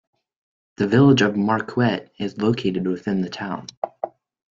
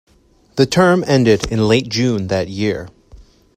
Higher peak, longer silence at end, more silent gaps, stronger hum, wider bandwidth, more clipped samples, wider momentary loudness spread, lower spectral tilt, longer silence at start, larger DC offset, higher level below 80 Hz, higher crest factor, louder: second, -4 dBFS vs 0 dBFS; about the same, 0.4 s vs 0.35 s; first, 3.77-3.82 s vs none; neither; second, 7.6 kHz vs 15.5 kHz; neither; first, 15 LU vs 8 LU; first, -7 dB/octave vs -5.5 dB/octave; first, 0.8 s vs 0.55 s; neither; second, -58 dBFS vs -42 dBFS; about the same, 18 dB vs 16 dB; second, -21 LUFS vs -15 LUFS